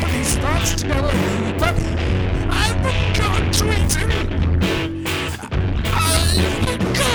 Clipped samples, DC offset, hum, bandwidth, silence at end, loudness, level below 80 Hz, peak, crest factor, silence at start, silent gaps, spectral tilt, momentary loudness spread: under 0.1%; under 0.1%; none; over 20 kHz; 0 s; -19 LUFS; -24 dBFS; 0 dBFS; 18 dB; 0 s; none; -4.5 dB/octave; 5 LU